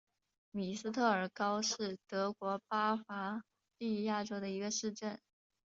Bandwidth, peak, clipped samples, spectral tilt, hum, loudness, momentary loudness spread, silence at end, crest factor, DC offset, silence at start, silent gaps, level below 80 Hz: 7.6 kHz; -18 dBFS; under 0.1%; -3.5 dB/octave; none; -38 LUFS; 10 LU; 0.5 s; 20 dB; under 0.1%; 0.55 s; none; -80 dBFS